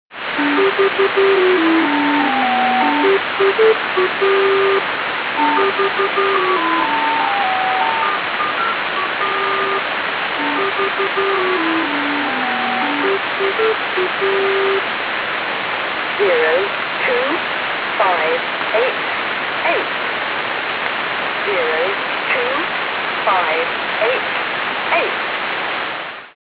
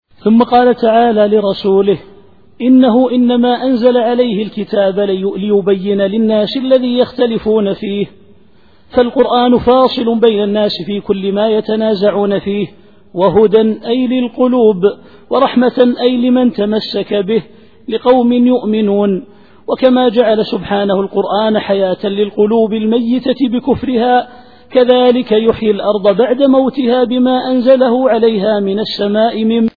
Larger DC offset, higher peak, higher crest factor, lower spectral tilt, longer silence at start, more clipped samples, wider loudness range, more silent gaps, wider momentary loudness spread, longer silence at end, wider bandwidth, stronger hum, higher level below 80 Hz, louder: second, under 0.1% vs 0.5%; about the same, -2 dBFS vs 0 dBFS; about the same, 16 dB vs 12 dB; second, -6 dB/octave vs -9 dB/octave; second, 0.1 s vs 0.25 s; neither; about the same, 3 LU vs 2 LU; neither; about the same, 5 LU vs 7 LU; about the same, 0.15 s vs 0.1 s; about the same, 5.2 kHz vs 4.9 kHz; neither; second, -60 dBFS vs -46 dBFS; second, -16 LUFS vs -12 LUFS